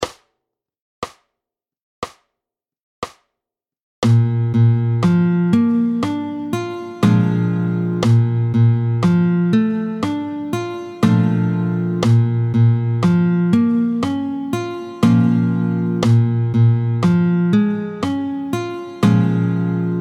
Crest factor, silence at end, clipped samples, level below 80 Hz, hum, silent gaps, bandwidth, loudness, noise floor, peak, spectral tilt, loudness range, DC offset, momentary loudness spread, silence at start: 16 dB; 0 s; under 0.1%; -52 dBFS; none; 0.81-1.02 s, 1.82-2.02 s, 2.83-3.02 s, 3.82-4.02 s; 10 kHz; -17 LUFS; -85 dBFS; -2 dBFS; -8.5 dB/octave; 5 LU; under 0.1%; 9 LU; 0 s